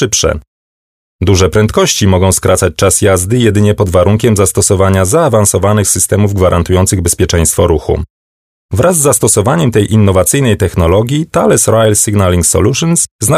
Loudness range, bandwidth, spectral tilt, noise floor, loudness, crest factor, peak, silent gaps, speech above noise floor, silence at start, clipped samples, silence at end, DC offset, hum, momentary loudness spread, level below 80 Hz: 2 LU; 16 kHz; -4.5 dB/octave; under -90 dBFS; -9 LUFS; 10 dB; 0 dBFS; 0.47-1.19 s, 8.10-8.69 s, 13.11-13.19 s; over 81 dB; 0 s; under 0.1%; 0 s; under 0.1%; none; 3 LU; -28 dBFS